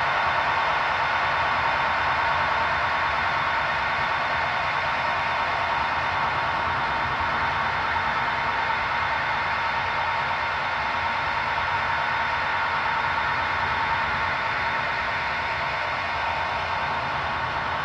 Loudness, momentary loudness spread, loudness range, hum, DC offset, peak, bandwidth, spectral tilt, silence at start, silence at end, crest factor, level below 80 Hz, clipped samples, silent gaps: -24 LUFS; 3 LU; 2 LU; none; under 0.1%; -10 dBFS; 9.8 kHz; -4 dB/octave; 0 s; 0 s; 14 dB; -48 dBFS; under 0.1%; none